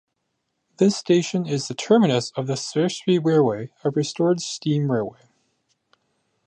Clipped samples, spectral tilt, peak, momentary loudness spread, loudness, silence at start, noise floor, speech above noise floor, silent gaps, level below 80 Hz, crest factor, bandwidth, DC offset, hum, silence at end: under 0.1%; -5.5 dB/octave; -4 dBFS; 8 LU; -22 LUFS; 0.8 s; -76 dBFS; 55 dB; none; -68 dBFS; 18 dB; 10 kHz; under 0.1%; none; 1.35 s